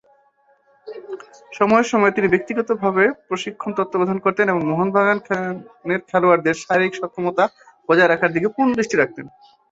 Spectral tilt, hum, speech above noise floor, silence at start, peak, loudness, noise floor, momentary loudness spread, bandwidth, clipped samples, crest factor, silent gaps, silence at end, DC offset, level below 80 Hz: -6 dB/octave; none; 40 dB; 0.85 s; -2 dBFS; -19 LUFS; -59 dBFS; 16 LU; 8 kHz; under 0.1%; 18 dB; none; 0.45 s; under 0.1%; -60 dBFS